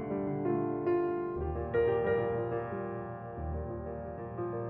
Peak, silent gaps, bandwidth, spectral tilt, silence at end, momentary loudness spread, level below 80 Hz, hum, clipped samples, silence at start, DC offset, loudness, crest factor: -18 dBFS; none; 4.1 kHz; -8 dB/octave; 0 s; 11 LU; -48 dBFS; none; under 0.1%; 0 s; under 0.1%; -34 LUFS; 14 dB